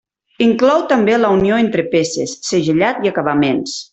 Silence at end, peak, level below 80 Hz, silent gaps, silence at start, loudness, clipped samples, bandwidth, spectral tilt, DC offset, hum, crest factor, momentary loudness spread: 0.1 s; -2 dBFS; -50 dBFS; none; 0.4 s; -15 LUFS; under 0.1%; 8.4 kHz; -5 dB/octave; under 0.1%; none; 14 dB; 5 LU